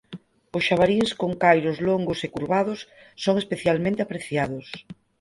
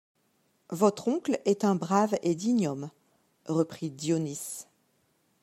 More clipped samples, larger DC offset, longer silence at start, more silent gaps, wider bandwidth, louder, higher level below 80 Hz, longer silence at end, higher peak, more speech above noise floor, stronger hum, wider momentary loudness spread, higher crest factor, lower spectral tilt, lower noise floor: neither; neither; second, 0.1 s vs 0.7 s; neither; second, 11.5 kHz vs 15.5 kHz; first, -23 LUFS vs -29 LUFS; first, -56 dBFS vs -76 dBFS; second, 0.3 s vs 0.8 s; first, -4 dBFS vs -8 dBFS; second, 20 dB vs 43 dB; neither; first, 17 LU vs 14 LU; about the same, 20 dB vs 22 dB; about the same, -6 dB/octave vs -6 dB/octave; second, -44 dBFS vs -71 dBFS